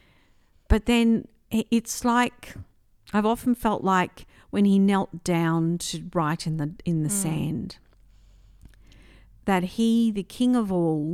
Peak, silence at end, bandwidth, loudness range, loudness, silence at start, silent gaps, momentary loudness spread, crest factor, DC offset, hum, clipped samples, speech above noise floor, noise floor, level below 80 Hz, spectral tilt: -6 dBFS; 0 s; 15.5 kHz; 5 LU; -24 LUFS; 0.7 s; none; 9 LU; 18 dB; under 0.1%; none; under 0.1%; 36 dB; -60 dBFS; -42 dBFS; -5.5 dB/octave